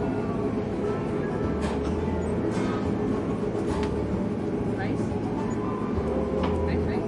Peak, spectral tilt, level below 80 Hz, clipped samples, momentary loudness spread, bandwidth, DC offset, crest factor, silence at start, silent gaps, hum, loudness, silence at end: -14 dBFS; -8 dB/octave; -42 dBFS; under 0.1%; 2 LU; 11.5 kHz; under 0.1%; 12 dB; 0 s; none; none; -28 LUFS; 0 s